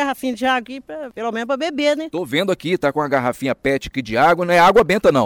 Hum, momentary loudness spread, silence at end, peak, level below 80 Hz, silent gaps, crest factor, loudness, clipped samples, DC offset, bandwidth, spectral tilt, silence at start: none; 12 LU; 0 s; -6 dBFS; -46 dBFS; none; 12 dB; -18 LUFS; under 0.1%; under 0.1%; 19 kHz; -5 dB/octave; 0 s